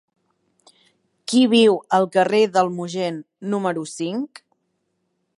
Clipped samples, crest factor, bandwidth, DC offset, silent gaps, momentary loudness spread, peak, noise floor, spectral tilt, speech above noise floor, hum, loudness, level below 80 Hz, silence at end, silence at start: under 0.1%; 18 dB; 11.5 kHz; under 0.1%; none; 13 LU; -4 dBFS; -72 dBFS; -5 dB/octave; 53 dB; none; -20 LUFS; -72 dBFS; 1.15 s; 1.3 s